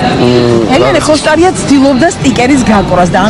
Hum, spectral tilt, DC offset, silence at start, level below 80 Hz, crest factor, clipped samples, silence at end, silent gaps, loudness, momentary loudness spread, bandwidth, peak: none; -5 dB/octave; under 0.1%; 0 s; -28 dBFS; 6 dB; 1%; 0 s; none; -7 LUFS; 2 LU; 12 kHz; 0 dBFS